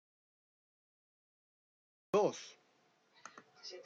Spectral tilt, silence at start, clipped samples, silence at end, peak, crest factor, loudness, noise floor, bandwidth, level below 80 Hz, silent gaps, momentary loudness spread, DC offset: -4.5 dB/octave; 2.15 s; under 0.1%; 0.05 s; -20 dBFS; 22 dB; -35 LUFS; -73 dBFS; 7.8 kHz; under -90 dBFS; none; 22 LU; under 0.1%